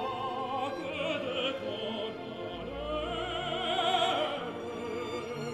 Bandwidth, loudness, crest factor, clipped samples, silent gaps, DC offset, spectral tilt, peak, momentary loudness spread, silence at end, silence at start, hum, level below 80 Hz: 14 kHz; -33 LUFS; 18 dB; under 0.1%; none; under 0.1%; -4.5 dB/octave; -16 dBFS; 10 LU; 0 s; 0 s; none; -54 dBFS